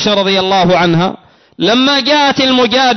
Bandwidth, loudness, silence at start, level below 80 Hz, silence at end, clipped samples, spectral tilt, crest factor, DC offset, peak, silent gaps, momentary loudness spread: 6.4 kHz; -10 LUFS; 0 s; -46 dBFS; 0 s; under 0.1%; -4.5 dB/octave; 8 dB; under 0.1%; -2 dBFS; none; 5 LU